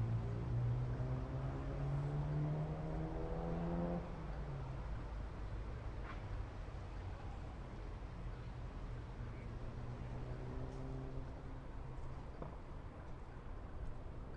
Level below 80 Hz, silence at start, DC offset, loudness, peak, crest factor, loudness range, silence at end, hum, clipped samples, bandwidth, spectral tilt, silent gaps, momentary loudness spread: -48 dBFS; 0 s; under 0.1%; -46 LUFS; -30 dBFS; 14 dB; 8 LU; 0 s; none; under 0.1%; 8.8 kHz; -8.5 dB/octave; none; 11 LU